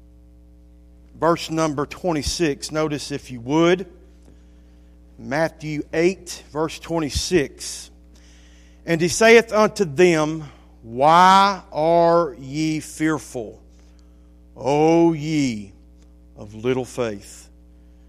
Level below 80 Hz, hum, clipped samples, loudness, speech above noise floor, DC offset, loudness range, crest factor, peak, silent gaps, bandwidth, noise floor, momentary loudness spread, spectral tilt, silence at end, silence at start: -44 dBFS; none; under 0.1%; -20 LUFS; 28 dB; under 0.1%; 8 LU; 20 dB; 0 dBFS; none; 15 kHz; -48 dBFS; 19 LU; -5 dB/octave; 0.65 s; 1.15 s